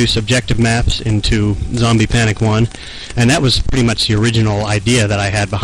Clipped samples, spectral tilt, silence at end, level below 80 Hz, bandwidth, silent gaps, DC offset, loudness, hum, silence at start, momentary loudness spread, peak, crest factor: under 0.1%; -5 dB/octave; 0 s; -24 dBFS; 11.5 kHz; none; 0.2%; -14 LUFS; none; 0 s; 4 LU; -2 dBFS; 10 dB